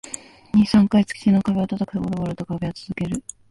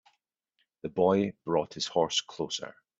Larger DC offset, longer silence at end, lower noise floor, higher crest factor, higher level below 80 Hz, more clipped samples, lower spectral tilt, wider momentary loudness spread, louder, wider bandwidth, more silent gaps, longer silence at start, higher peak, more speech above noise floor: neither; about the same, 0.3 s vs 0.3 s; second, -39 dBFS vs -78 dBFS; about the same, 16 dB vs 20 dB; first, -48 dBFS vs -68 dBFS; neither; first, -6.5 dB/octave vs -4 dB/octave; about the same, 13 LU vs 11 LU; first, -21 LUFS vs -29 LUFS; first, 11.5 kHz vs 8 kHz; neither; second, 0.05 s vs 0.85 s; first, -6 dBFS vs -10 dBFS; second, 19 dB vs 48 dB